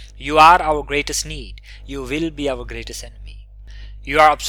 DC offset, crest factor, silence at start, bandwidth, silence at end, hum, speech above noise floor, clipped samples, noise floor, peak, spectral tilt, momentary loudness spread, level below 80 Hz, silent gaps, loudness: under 0.1%; 18 dB; 0 s; 19.5 kHz; 0 s; 50 Hz at -35 dBFS; 19 dB; under 0.1%; -37 dBFS; 0 dBFS; -3 dB/octave; 22 LU; -34 dBFS; none; -16 LUFS